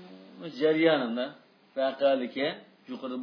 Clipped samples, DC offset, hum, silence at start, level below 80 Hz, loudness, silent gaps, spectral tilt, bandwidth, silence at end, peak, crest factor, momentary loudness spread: under 0.1%; under 0.1%; none; 0 s; -84 dBFS; -28 LUFS; none; -7 dB/octave; 5.4 kHz; 0 s; -10 dBFS; 20 dB; 19 LU